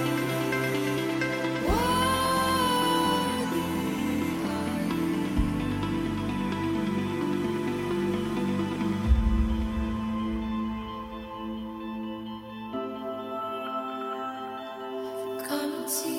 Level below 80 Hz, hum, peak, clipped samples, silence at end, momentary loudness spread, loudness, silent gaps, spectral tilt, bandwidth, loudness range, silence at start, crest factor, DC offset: -38 dBFS; none; -10 dBFS; under 0.1%; 0 s; 12 LU; -29 LUFS; none; -5 dB/octave; 17 kHz; 9 LU; 0 s; 18 dB; under 0.1%